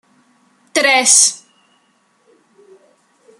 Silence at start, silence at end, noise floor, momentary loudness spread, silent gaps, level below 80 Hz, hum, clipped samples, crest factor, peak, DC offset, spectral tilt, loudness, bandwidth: 0.75 s; 2.05 s; -59 dBFS; 14 LU; none; -70 dBFS; none; under 0.1%; 20 dB; 0 dBFS; under 0.1%; 2 dB/octave; -11 LUFS; 15.5 kHz